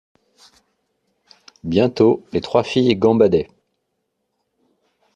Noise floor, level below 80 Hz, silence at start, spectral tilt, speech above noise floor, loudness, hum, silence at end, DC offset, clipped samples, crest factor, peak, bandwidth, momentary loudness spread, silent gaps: -74 dBFS; -54 dBFS; 1.65 s; -7 dB/octave; 58 dB; -17 LUFS; none; 1.7 s; under 0.1%; under 0.1%; 18 dB; -2 dBFS; 9 kHz; 8 LU; none